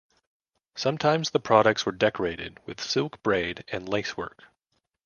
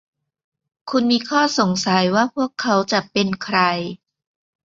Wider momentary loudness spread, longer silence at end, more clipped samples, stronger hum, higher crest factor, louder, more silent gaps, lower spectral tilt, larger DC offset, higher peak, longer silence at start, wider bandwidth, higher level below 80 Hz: first, 16 LU vs 6 LU; about the same, 0.75 s vs 0.7 s; neither; neither; about the same, 24 dB vs 20 dB; second, -26 LUFS vs -19 LUFS; neither; about the same, -4.5 dB/octave vs -4.5 dB/octave; neither; about the same, -4 dBFS vs -2 dBFS; about the same, 0.75 s vs 0.85 s; second, 7.2 kHz vs 8 kHz; about the same, -58 dBFS vs -62 dBFS